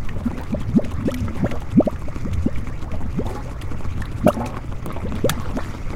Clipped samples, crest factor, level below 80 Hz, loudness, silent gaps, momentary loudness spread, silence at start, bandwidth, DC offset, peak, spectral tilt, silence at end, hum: under 0.1%; 20 dB; -30 dBFS; -24 LUFS; none; 11 LU; 0 s; 16.5 kHz; under 0.1%; -2 dBFS; -7 dB/octave; 0 s; none